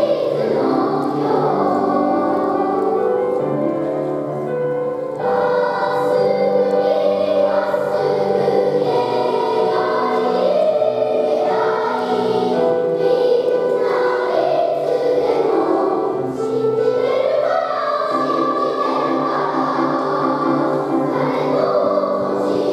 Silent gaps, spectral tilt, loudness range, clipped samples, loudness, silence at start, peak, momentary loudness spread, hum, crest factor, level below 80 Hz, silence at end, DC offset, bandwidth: none; -7 dB/octave; 2 LU; under 0.1%; -18 LUFS; 0 s; -4 dBFS; 3 LU; none; 14 dB; -64 dBFS; 0 s; under 0.1%; 12 kHz